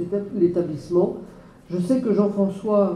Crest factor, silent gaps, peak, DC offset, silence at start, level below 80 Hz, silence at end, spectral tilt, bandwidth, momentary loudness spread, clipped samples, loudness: 16 dB; none; -6 dBFS; under 0.1%; 0 s; -56 dBFS; 0 s; -9 dB/octave; 11 kHz; 7 LU; under 0.1%; -22 LUFS